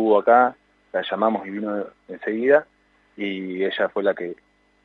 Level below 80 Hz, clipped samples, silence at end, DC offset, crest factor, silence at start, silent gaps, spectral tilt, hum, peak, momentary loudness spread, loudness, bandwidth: -70 dBFS; under 0.1%; 0.5 s; under 0.1%; 20 dB; 0 s; none; -7.5 dB/octave; 50 Hz at -60 dBFS; -2 dBFS; 14 LU; -22 LUFS; 4.4 kHz